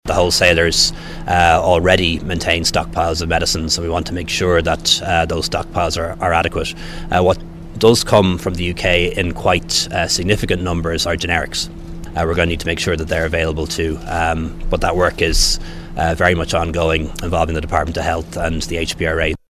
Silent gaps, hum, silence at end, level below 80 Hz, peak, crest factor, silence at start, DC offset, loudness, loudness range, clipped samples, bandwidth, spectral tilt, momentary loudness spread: none; none; 0.15 s; -28 dBFS; 0 dBFS; 16 dB; 0.05 s; under 0.1%; -17 LUFS; 3 LU; under 0.1%; 16 kHz; -4 dB/octave; 8 LU